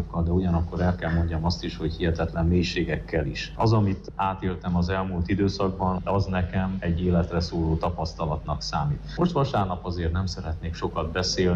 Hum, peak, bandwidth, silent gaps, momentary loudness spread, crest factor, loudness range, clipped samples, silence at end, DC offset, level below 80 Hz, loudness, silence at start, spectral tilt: none; -12 dBFS; 7.6 kHz; none; 6 LU; 12 dB; 2 LU; under 0.1%; 0 s; under 0.1%; -36 dBFS; -26 LUFS; 0 s; -6.5 dB/octave